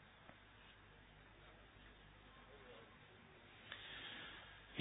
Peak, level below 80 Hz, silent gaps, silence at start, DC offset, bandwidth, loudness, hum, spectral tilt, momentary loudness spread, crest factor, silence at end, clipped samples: -28 dBFS; -72 dBFS; none; 0 s; under 0.1%; 3.9 kHz; -58 LUFS; 50 Hz at -70 dBFS; -1.5 dB/octave; 12 LU; 30 dB; 0 s; under 0.1%